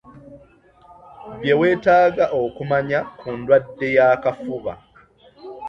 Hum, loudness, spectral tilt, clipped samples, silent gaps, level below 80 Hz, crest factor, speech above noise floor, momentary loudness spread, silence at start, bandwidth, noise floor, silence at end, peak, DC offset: none; -19 LUFS; -7.5 dB/octave; under 0.1%; none; -54 dBFS; 18 dB; 33 dB; 15 LU; 0.15 s; 6.6 kHz; -51 dBFS; 0 s; -2 dBFS; under 0.1%